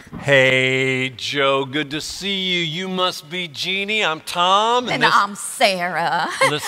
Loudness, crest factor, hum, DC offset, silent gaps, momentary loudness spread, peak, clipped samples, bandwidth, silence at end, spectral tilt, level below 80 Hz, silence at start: -18 LUFS; 18 dB; none; under 0.1%; none; 8 LU; -2 dBFS; under 0.1%; 16 kHz; 0 s; -3.5 dB/octave; -58 dBFS; 0.05 s